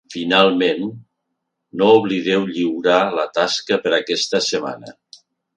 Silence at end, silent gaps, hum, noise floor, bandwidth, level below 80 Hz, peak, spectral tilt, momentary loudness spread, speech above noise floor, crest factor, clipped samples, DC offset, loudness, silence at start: 0.65 s; none; none; -76 dBFS; 9.8 kHz; -64 dBFS; 0 dBFS; -4 dB/octave; 11 LU; 58 dB; 18 dB; under 0.1%; under 0.1%; -17 LUFS; 0.1 s